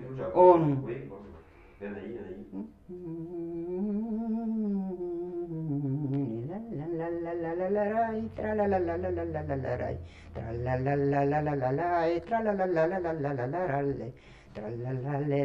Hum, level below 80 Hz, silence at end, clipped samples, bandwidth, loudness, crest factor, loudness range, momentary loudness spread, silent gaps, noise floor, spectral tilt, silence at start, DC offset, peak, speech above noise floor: none; -54 dBFS; 0 s; under 0.1%; 6.4 kHz; -30 LUFS; 24 dB; 6 LU; 14 LU; none; -52 dBFS; -10 dB/octave; 0 s; under 0.1%; -6 dBFS; 23 dB